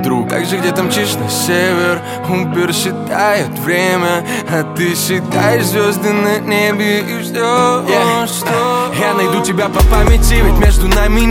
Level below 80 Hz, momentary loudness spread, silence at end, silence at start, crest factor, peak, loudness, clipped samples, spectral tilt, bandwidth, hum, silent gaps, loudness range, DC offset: -18 dBFS; 5 LU; 0 s; 0 s; 12 dB; 0 dBFS; -13 LUFS; under 0.1%; -4.5 dB/octave; 17 kHz; none; none; 2 LU; under 0.1%